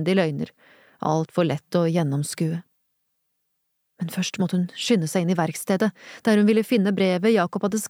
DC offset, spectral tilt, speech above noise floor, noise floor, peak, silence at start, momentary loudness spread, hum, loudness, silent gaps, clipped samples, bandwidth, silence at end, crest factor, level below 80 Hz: under 0.1%; -6 dB/octave; 52 dB; -75 dBFS; -8 dBFS; 0 s; 8 LU; none; -23 LUFS; none; under 0.1%; over 20 kHz; 0 s; 14 dB; -68 dBFS